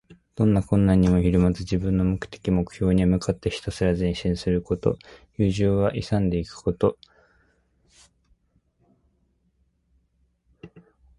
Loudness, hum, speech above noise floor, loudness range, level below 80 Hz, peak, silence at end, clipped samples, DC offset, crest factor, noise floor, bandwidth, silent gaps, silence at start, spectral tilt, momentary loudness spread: -23 LUFS; none; 46 dB; 8 LU; -38 dBFS; -6 dBFS; 0.5 s; under 0.1%; under 0.1%; 18 dB; -68 dBFS; 11.5 kHz; none; 0.35 s; -8 dB/octave; 8 LU